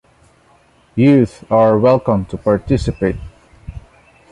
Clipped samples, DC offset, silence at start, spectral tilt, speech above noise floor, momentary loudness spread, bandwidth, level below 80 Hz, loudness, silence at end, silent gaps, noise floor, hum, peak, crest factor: under 0.1%; under 0.1%; 0.95 s; -8.5 dB/octave; 38 dB; 19 LU; 10.5 kHz; -36 dBFS; -15 LUFS; 0.5 s; none; -52 dBFS; none; -2 dBFS; 14 dB